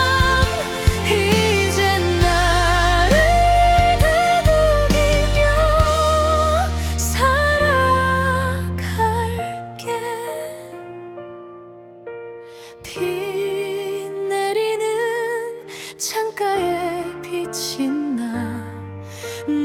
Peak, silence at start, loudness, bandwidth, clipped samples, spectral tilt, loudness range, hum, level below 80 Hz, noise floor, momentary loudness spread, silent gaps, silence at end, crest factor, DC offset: -2 dBFS; 0 s; -18 LUFS; 17.5 kHz; under 0.1%; -4.5 dB/octave; 13 LU; none; -26 dBFS; -40 dBFS; 19 LU; none; 0 s; 16 dB; under 0.1%